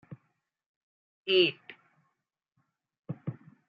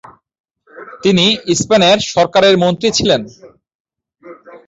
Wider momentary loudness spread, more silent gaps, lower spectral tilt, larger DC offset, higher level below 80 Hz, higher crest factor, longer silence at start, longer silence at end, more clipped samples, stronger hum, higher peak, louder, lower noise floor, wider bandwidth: first, 19 LU vs 6 LU; first, 0.66-1.23 s, 2.99-3.03 s vs 3.75-3.85 s; first, -7.5 dB/octave vs -4 dB/octave; neither; second, -84 dBFS vs -48 dBFS; first, 24 dB vs 14 dB; second, 0.1 s vs 0.75 s; first, 0.35 s vs 0.1 s; neither; neither; second, -10 dBFS vs 0 dBFS; second, -28 LUFS vs -12 LUFS; first, -83 dBFS vs -39 dBFS; second, 5.4 kHz vs 8 kHz